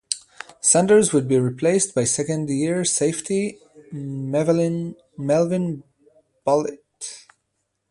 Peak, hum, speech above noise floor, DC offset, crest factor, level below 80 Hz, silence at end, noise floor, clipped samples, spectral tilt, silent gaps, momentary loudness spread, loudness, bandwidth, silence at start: -2 dBFS; none; 54 dB; under 0.1%; 20 dB; -62 dBFS; 0.7 s; -75 dBFS; under 0.1%; -4.5 dB/octave; none; 18 LU; -21 LUFS; 11.5 kHz; 0.1 s